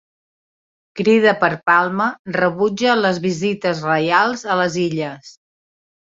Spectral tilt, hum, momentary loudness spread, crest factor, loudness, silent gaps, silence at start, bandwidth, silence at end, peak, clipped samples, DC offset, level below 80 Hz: -5 dB/octave; none; 7 LU; 18 dB; -17 LUFS; 2.19-2.25 s; 0.95 s; 7.8 kHz; 0.8 s; -2 dBFS; under 0.1%; under 0.1%; -60 dBFS